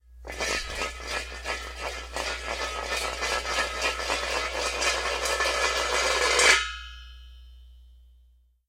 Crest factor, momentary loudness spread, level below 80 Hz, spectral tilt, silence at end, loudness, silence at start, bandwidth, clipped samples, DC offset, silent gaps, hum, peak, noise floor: 24 dB; 13 LU; -44 dBFS; -1 dB/octave; 0.65 s; -26 LUFS; 0.1 s; 16 kHz; under 0.1%; under 0.1%; none; none; -4 dBFS; -60 dBFS